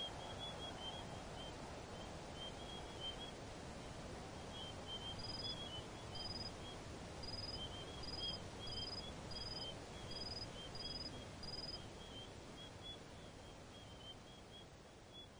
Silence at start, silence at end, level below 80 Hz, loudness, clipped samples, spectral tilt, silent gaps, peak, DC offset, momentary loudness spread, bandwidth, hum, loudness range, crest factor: 0 s; 0 s; -60 dBFS; -49 LUFS; under 0.1%; -4 dB/octave; none; -34 dBFS; under 0.1%; 11 LU; over 20 kHz; none; 5 LU; 16 dB